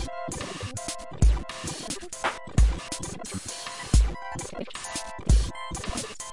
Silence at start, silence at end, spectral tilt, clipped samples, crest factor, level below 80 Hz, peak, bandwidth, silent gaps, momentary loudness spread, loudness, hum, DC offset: 0 s; 0 s; -4.5 dB/octave; under 0.1%; 20 dB; -28 dBFS; -8 dBFS; 11.5 kHz; none; 10 LU; -29 LUFS; none; under 0.1%